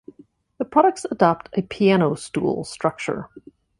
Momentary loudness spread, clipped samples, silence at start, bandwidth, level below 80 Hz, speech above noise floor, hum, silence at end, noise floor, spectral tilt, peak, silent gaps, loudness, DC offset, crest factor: 11 LU; under 0.1%; 0.6 s; 11.5 kHz; -58 dBFS; 32 dB; none; 0.4 s; -53 dBFS; -6 dB/octave; -2 dBFS; none; -21 LUFS; under 0.1%; 20 dB